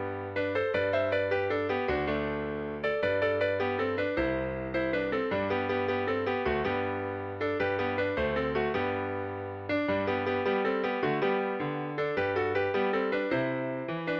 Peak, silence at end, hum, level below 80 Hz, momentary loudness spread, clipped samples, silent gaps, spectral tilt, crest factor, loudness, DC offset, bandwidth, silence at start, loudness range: -14 dBFS; 0 s; none; -52 dBFS; 5 LU; under 0.1%; none; -7.5 dB/octave; 14 dB; -30 LUFS; under 0.1%; 6.6 kHz; 0 s; 1 LU